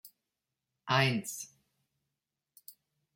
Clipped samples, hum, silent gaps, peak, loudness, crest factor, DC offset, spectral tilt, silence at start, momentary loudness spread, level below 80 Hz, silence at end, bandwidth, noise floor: under 0.1%; none; none; -12 dBFS; -31 LUFS; 24 dB; under 0.1%; -4 dB/octave; 0.05 s; 25 LU; -76 dBFS; 0.45 s; 16.5 kHz; -88 dBFS